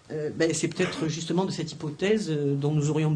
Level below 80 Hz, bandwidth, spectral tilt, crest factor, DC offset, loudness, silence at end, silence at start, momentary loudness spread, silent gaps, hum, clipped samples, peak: -64 dBFS; 10.5 kHz; -5.5 dB/octave; 16 dB; under 0.1%; -27 LUFS; 0 s; 0.1 s; 6 LU; none; none; under 0.1%; -10 dBFS